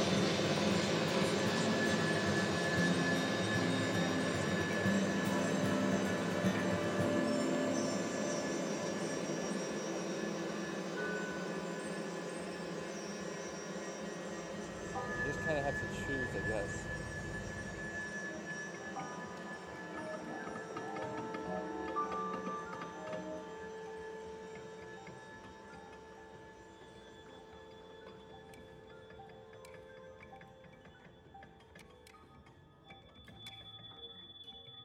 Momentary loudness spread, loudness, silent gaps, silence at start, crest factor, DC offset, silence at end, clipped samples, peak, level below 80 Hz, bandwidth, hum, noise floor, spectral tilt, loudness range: 21 LU; -37 LUFS; none; 0 s; 20 dB; under 0.1%; 0 s; under 0.1%; -18 dBFS; -64 dBFS; 19.5 kHz; none; -60 dBFS; -4.5 dB/octave; 21 LU